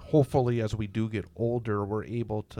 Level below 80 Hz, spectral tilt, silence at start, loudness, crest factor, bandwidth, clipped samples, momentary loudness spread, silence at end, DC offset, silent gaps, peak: -52 dBFS; -8.5 dB/octave; 0 s; -29 LUFS; 18 dB; 14 kHz; under 0.1%; 8 LU; 0 s; under 0.1%; none; -10 dBFS